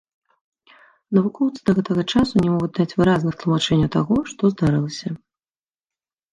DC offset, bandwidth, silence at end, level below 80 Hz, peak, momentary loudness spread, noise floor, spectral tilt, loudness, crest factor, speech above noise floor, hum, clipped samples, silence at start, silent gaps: under 0.1%; 10.5 kHz; 1.15 s; -46 dBFS; -4 dBFS; 5 LU; under -90 dBFS; -7 dB/octave; -20 LUFS; 16 dB; over 71 dB; none; under 0.1%; 1.1 s; none